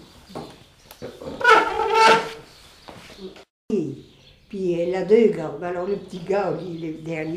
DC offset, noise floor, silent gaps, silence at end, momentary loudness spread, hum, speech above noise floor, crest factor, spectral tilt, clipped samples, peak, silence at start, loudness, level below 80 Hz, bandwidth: under 0.1%; -51 dBFS; 3.50-3.69 s; 0 s; 25 LU; none; 28 dB; 22 dB; -4.5 dB/octave; under 0.1%; 0 dBFS; 0.3 s; -21 LUFS; -56 dBFS; 14 kHz